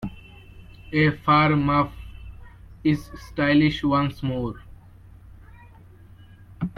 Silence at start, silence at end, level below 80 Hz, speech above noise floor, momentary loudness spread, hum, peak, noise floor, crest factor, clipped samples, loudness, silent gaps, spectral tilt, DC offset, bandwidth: 0 s; 0.05 s; -44 dBFS; 26 dB; 24 LU; none; -6 dBFS; -48 dBFS; 18 dB; under 0.1%; -22 LUFS; none; -7.5 dB/octave; under 0.1%; 12 kHz